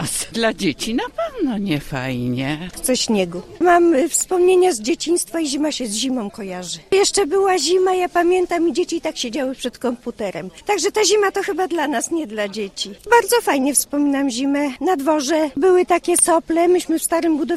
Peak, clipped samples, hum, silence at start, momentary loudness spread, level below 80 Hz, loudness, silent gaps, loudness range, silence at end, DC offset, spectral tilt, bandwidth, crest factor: 0 dBFS; under 0.1%; none; 0 s; 10 LU; -48 dBFS; -18 LUFS; none; 3 LU; 0 s; under 0.1%; -3.5 dB/octave; 15.5 kHz; 18 dB